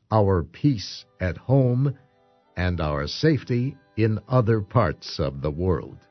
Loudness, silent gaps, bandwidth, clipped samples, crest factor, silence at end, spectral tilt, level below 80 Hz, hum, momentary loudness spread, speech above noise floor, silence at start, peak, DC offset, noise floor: -24 LUFS; none; 6.4 kHz; under 0.1%; 18 dB; 0.15 s; -7.5 dB/octave; -42 dBFS; none; 9 LU; 38 dB; 0.1 s; -4 dBFS; under 0.1%; -61 dBFS